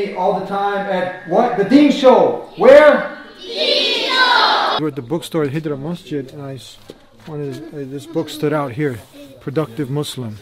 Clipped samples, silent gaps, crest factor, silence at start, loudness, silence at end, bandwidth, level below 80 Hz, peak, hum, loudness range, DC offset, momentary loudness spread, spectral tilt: under 0.1%; none; 16 dB; 0 s; -15 LUFS; 0 s; 15 kHz; -54 dBFS; 0 dBFS; none; 13 LU; under 0.1%; 19 LU; -5.5 dB/octave